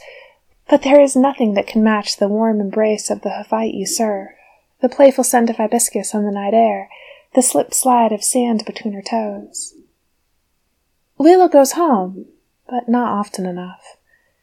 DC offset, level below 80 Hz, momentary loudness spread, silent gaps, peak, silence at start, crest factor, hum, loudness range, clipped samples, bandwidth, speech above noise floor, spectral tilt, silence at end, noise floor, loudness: under 0.1%; -60 dBFS; 15 LU; none; 0 dBFS; 0.05 s; 16 dB; none; 3 LU; under 0.1%; 19 kHz; 51 dB; -4 dB/octave; 0.7 s; -66 dBFS; -16 LUFS